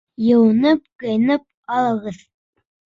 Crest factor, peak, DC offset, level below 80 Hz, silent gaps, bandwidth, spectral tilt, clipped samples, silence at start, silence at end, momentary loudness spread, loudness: 14 dB; -4 dBFS; under 0.1%; -60 dBFS; 0.95-0.99 s, 1.54-1.63 s; 7.4 kHz; -7.5 dB/octave; under 0.1%; 0.2 s; 0.7 s; 10 LU; -18 LUFS